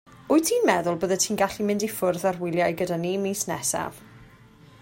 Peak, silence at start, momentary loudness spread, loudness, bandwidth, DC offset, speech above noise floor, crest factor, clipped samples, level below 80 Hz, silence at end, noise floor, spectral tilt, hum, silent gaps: -6 dBFS; 0.1 s; 5 LU; -24 LUFS; 16.5 kHz; under 0.1%; 27 dB; 20 dB; under 0.1%; -60 dBFS; 0.55 s; -51 dBFS; -4 dB/octave; none; none